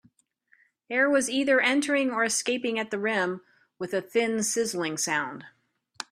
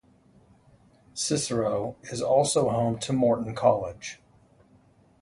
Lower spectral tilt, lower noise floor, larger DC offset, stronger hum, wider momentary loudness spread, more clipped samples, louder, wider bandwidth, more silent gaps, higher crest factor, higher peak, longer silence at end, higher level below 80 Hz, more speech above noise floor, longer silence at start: second, -2.5 dB/octave vs -5 dB/octave; first, -66 dBFS vs -59 dBFS; neither; neither; second, 11 LU vs 15 LU; neither; about the same, -26 LUFS vs -26 LUFS; first, 15.5 kHz vs 11.5 kHz; neither; about the same, 18 dB vs 20 dB; about the same, -10 dBFS vs -8 dBFS; second, 0.1 s vs 1.1 s; second, -74 dBFS vs -58 dBFS; first, 40 dB vs 34 dB; second, 0.9 s vs 1.15 s